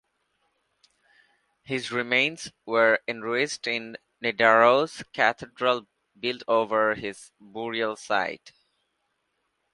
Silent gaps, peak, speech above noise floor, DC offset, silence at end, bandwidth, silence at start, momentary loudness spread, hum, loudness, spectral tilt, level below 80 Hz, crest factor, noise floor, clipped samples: none; -4 dBFS; 51 dB; under 0.1%; 1.25 s; 11.5 kHz; 1.7 s; 14 LU; none; -25 LUFS; -3.5 dB/octave; -70 dBFS; 24 dB; -76 dBFS; under 0.1%